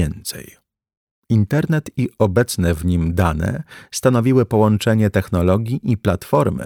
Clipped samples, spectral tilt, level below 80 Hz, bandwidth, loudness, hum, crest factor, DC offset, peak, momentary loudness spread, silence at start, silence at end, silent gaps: under 0.1%; -6.5 dB/octave; -36 dBFS; 17.5 kHz; -18 LUFS; none; 16 dB; under 0.1%; -2 dBFS; 9 LU; 0 s; 0 s; 0.97-1.23 s